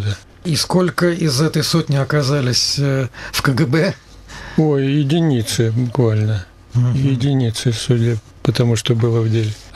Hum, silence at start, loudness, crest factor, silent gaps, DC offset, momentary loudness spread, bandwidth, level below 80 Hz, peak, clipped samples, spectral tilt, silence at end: none; 0 s; -17 LUFS; 14 dB; none; under 0.1%; 6 LU; 14.5 kHz; -44 dBFS; -2 dBFS; under 0.1%; -5.5 dB/octave; 0.05 s